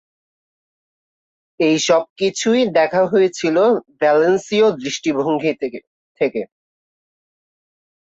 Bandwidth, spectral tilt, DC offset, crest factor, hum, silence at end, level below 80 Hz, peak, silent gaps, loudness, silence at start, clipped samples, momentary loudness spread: 8 kHz; -4 dB/octave; under 0.1%; 16 dB; none; 1.65 s; -64 dBFS; -4 dBFS; 2.10-2.16 s, 5.87-6.15 s; -17 LUFS; 1.6 s; under 0.1%; 7 LU